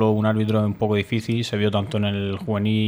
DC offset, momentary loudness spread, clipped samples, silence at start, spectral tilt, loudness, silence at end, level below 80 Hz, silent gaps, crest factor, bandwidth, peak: under 0.1%; 4 LU; under 0.1%; 0 s; -7 dB/octave; -22 LUFS; 0 s; -56 dBFS; none; 14 dB; 12 kHz; -6 dBFS